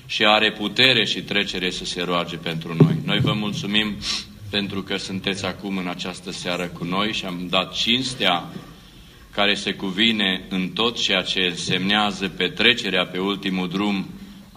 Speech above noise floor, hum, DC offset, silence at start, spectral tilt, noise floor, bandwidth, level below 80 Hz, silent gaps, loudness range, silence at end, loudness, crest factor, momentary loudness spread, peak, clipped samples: 23 dB; none; under 0.1%; 0.05 s; -4 dB/octave; -45 dBFS; 15.5 kHz; -52 dBFS; none; 5 LU; 0 s; -21 LUFS; 22 dB; 11 LU; 0 dBFS; under 0.1%